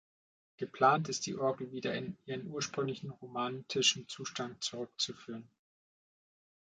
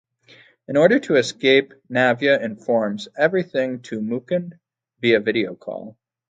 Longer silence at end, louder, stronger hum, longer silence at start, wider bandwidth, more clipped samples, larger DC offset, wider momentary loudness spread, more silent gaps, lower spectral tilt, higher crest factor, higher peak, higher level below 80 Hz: first, 1.2 s vs 0.4 s; second, -35 LUFS vs -20 LUFS; neither; about the same, 0.6 s vs 0.7 s; about the same, 9.4 kHz vs 9.2 kHz; neither; neither; first, 15 LU vs 11 LU; neither; second, -3 dB/octave vs -5.5 dB/octave; about the same, 22 dB vs 20 dB; second, -14 dBFS vs 0 dBFS; second, -78 dBFS vs -68 dBFS